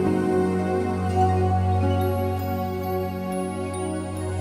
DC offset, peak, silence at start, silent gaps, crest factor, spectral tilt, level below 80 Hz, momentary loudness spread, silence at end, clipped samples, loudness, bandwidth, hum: under 0.1%; -10 dBFS; 0 s; none; 14 dB; -7.5 dB/octave; -48 dBFS; 7 LU; 0 s; under 0.1%; -24 LUFS; 14.5 kHz; none